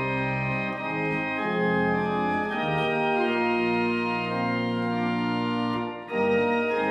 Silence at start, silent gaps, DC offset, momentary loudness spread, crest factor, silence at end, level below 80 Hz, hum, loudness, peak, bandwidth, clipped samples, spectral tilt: 0 s; none; under 0.1%; 4 LU; 14 dB; 0 s; -56 dBFS; none; -26 LUFS; -12 dBFS; 9.4 kHz; under 0.1%; -7.5 dB/octave